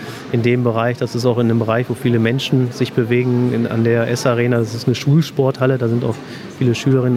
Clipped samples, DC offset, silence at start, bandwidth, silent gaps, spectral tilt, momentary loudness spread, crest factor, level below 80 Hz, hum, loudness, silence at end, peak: under 0.1%; under 0.1%; 0 s; 14.5 kHz; none; -7 dB/octave; 4 LU; 14 dB; -56 dBFS; none; -17 LUFS; 0 s; -2 dBFS